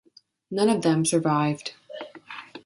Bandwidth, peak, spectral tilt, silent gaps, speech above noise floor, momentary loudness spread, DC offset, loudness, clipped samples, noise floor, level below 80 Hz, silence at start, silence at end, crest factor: 11.5 kHz; -10 dBFS; -5 dB/octave; none; 20 dB; 18 LU; under 0.1%; -24 LUFS; under 0.1%; -43 dBFS; -68 dBFS; 0.5 s; 0.05 s; 16 dB